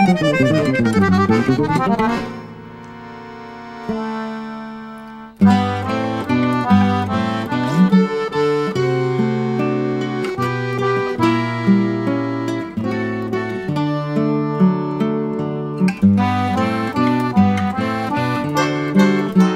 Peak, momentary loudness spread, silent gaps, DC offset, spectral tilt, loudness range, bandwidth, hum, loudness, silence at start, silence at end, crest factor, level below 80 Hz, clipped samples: -2 dBFS; 15 LU; none; under 0.1%; -7.5 dB/octave; 4 LU; 12.5 kHz; none; -18 LUFS; 0 s; 0 s; 16 dB; -50 dBFS; under 0.1%